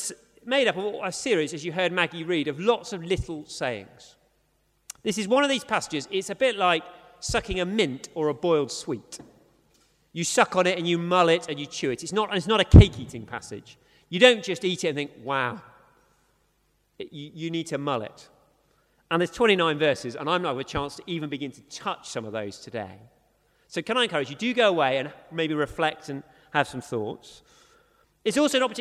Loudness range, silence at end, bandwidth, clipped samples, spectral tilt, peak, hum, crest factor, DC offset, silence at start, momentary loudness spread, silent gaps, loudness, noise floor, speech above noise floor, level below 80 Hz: 11 LU; 0 s; 14 kHz; under 0.1%; -5 dB/octave; 0 dBFS; none; 26 dB; under 0.1%; 0 s; 15 LU; none; -25 LUFS; -69 dBFS; 44 dB; -38 dBFS